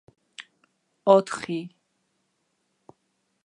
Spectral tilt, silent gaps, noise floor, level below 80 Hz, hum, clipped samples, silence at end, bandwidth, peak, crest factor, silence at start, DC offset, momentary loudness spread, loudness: -5.5 dB/octave; none; -74 dBFS; -76 dBFS; none; under 0.1%; 1.75 s; 11.5 kHz; -4 dBFS; 24 dB; 0.4 s; under 0.1%; 25 LU; -23 LUFS